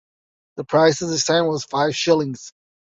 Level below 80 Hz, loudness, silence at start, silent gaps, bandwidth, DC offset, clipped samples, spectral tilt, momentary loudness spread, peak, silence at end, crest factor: -62 dBFS; -19 LUFS; 0.55 s; none; 8 kHz; under 0.1%; under 0.1%; -4 dB/octave; 17 LU; -4 dBFS; 0.45 s; 18 dB